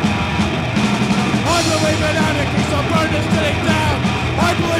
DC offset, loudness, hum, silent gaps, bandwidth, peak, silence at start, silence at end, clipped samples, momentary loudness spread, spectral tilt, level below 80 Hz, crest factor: under 0.1%; -16 LUFS; none; none; 16 kHz; -4 dBFS; 0 s; 0 s; under 0.1%; 2 LU; -5 dB/octave; -32 dBFS; 14 dB